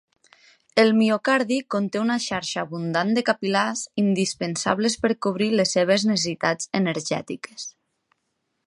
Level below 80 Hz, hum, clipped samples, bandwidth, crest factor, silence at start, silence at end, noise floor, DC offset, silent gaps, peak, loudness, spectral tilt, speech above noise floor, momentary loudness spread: -64 dBFS; none; under 0.1%; 11.5 kHz; 20 dB; 0.75 s; 0.95 s; -75 dBFS; under 0.1%; none; -4 dBFS; -23 LUFS; -4 dB/octave; 53 dB; 8 LU